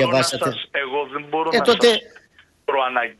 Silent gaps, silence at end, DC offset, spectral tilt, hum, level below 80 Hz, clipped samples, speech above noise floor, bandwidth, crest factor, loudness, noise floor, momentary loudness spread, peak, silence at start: none; 0.1 s; under 0.1%; -3.5 dB/octave; none; -60 dBFS; under 0.1%; 35 dB; 12.5 kHz; 18 dB; -20 LUFS; -55 dBFS; 10 LU; -2 dBFS; 0 s